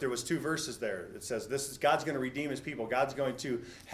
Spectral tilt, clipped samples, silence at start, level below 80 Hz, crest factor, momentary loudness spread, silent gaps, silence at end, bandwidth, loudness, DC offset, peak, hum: -4 dB/octave; under 0.1%; 0 s; -64 dBFS; 20 dB; 8 LU; none; 0 s; 16 kHz; -34 LUFS; under 0.1%; -14 dBFS; none